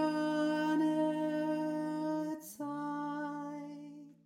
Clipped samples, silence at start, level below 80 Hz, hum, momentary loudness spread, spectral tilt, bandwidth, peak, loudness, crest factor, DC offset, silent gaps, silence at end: under 0.1%; 0 s; -84 dBFS; none; 13 LU; -6 dB/octave; 16 kHz; -22 dBFS; -35 LUFS; 14 dB; under 0.1%; none; 0.15 s